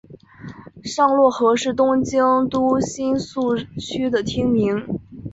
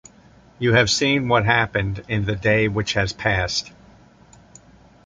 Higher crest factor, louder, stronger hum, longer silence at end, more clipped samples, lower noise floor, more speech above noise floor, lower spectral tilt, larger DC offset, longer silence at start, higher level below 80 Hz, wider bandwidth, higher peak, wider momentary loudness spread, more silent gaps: about the same, 16 dB vs 20 dB; about the same, -19 LUFS vs -20 LUFS; neither; second, 0 s vs 1.35 s; neither; second, -39 dBFS vs -50 dBFS; second, 20 dB vs 30 dB; about the same, -5.5 dB/octave vs -4.5 dB/octave; neither; second, 0.1 s vs 0.6 s; second, -50 dBFS vs -42 dBFS; second, 8 kHz vs 9.4 kHz; about the same, -4 dBFS vs -2 dBFS; first, 15 LU vs 8 LU; neither